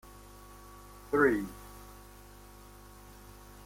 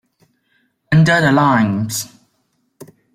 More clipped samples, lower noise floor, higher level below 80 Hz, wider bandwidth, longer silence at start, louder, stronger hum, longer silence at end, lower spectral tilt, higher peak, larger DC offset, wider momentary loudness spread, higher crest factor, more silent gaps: neither; second, -52 dBFS vs -65 dBFS; about the same, -54 dBFS vs -50 dBFS; about the same, 16.5 kHz vs 16 kHz; second, 0.5 s vs 0.9 s; second, -30 LUFS vs -14 LUFS; first, 50 Hz at -55 dBFS vs none; first, 1.75 s vs 0.3 s; about the same, -6 dB/octave vs -5.5 dB/octave; second, -14 dBFS vs -2 dBFS; neither; first, 26 LU vs 12 LU; first, 22 dB vs 16 dB; neither